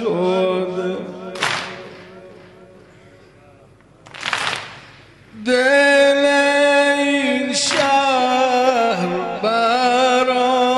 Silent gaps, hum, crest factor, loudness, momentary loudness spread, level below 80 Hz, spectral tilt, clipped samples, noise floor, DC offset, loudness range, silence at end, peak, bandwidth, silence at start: none; none; 14 dB; -16 LUFS; 15 LU; -60 dBFS; -3 dB/octave; under 0.1%; -48 dBFS; under 0.1%; 14 LU; 0 s; -4 dBFS; 11.5 kHz; 0 s